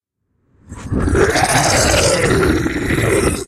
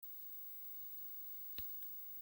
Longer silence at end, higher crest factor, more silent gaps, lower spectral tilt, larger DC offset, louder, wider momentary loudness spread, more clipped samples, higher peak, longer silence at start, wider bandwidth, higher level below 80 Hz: about the same, 0 s vs 0 s; about the same, 16 dB vs 18 dB; neither; about the same, -4 dB/octave vs -3 dB/octave; neither; first, -14 LUFS vs -45 LUFS; first, 7 LU vs 3 LU; neither; first, 0 dBFS vs -32 dBFS; first, 0.7 s vs 0 s; about the same, 16 kHz vs 17 kHz; first, -28 dBFS vs -76 dBFS